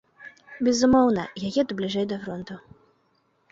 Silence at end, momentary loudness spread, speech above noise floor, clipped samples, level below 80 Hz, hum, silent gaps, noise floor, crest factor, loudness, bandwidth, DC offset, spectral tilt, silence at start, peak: 0.9 s; 20 LU; 44 dB; under 0.1%; -54 dBFS; none; none; -68 dBFS; 18 dB; -24 LUFS; 7.8 kHz; under 0.1%; -5 dB/octave; 0.2 s; -8 dBFS